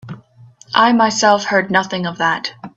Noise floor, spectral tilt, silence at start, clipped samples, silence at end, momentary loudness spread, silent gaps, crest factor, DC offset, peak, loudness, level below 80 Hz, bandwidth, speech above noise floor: -45 dBFS; -3.5 dB/octave; 0.05 s; under 0.1%; 0.1 s; 10 LU; none; 16 dB; under 0.1%; 0 dBFS; -15 LUFS; -60 dBFS; 8 kHz; 30 dB